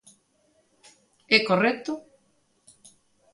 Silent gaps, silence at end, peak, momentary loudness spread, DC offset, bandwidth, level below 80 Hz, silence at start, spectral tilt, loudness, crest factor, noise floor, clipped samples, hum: none; 1.35 s; -4 dBFS; 16 LU; under 0.1%; 11.5 kHz; -74 dBFS; 1.3 s; -4.5 dB/octave; -23 LUFS; 24 dB; -67 dBFS; under 0.1%; none